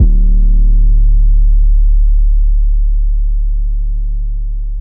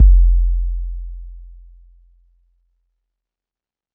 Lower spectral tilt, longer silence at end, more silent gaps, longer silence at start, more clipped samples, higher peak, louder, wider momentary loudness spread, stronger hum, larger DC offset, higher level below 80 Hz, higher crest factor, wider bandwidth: second, -15.5 dB/octave vs -17 dB/octave; second, 0 s vs 2.5 s; neither; about the same, 0 s vs 0 s; neither; about the same, -2 dBFS vs 0 dBFS; first, -15 LUFS vs -19 LUFS; second, 8 LU vs 25 LU; neither; first, 1% vs under 0.1%; first, -8 dBFS vs -18 dBFS; second, 6 dB vs 16 dB; first, 0.5 kHz vs 0.2 kHz